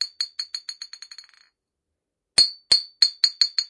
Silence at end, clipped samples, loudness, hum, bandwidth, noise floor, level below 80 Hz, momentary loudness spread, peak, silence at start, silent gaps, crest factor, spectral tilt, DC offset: 0.05 s; under 0.1%; -20 LUFS; none; 11.5 kHz; -83 dBFS; -62 dBFS; 20 LU; -2 dBFS; 0 s; none; 22 dB; 2.5 dB/octave; under 0.1%